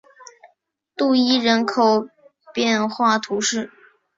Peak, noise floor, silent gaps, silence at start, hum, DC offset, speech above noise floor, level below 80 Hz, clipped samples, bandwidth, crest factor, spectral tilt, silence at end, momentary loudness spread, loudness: -4 dBFS; -66 dBFS; none; 1 s; none; under 0.1%; 47 dB; -66 dBFS; under 0.1%; 7.8 kHz; 18 dB; -3 dB/octave; 0.5 s; 15 LU; -19 LUFS